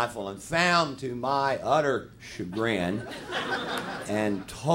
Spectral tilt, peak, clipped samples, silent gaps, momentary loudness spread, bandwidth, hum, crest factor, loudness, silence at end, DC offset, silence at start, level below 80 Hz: -4.5 dB/octave; -10 dBFS; under 0.1%; none; 11 LU; 16 kHz; none; 18 dB; -28 LUFS; 0 s; under 0.1%; 0 s; -58 dBFS